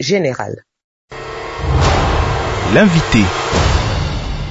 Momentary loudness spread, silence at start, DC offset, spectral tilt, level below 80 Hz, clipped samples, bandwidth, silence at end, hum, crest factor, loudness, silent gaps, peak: 16 LU; 0 s; under 0.1%; -5.5 dB/octave; -24 dBFS; under 0.1%; 8 kHz; 0 s; none; 14 dB; -15 LUFS; 0.84-1.08 s; 0 dBFS